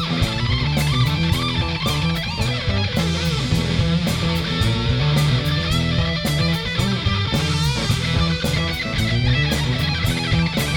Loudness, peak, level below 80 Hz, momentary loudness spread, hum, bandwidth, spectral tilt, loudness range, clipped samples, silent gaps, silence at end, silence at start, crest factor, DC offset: -20 LUFS; -6 dBFS; -30 dBFS; 2 LU; none; 19 kHz; -5 dB/octave; 1 LU; under 0.1%; none; 0 s; 0 s; 14 dB; under 0.1%